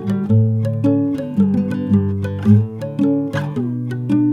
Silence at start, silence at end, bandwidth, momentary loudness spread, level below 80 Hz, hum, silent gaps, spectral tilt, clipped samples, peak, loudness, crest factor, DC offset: 0 s; 0 s; 6.6 kHz; 7 LU; -56 dBFS; none; none; -10 dB/octave; under 0.1%; 0 dBFS; -18 LUFS; 16 dB; under 0.1%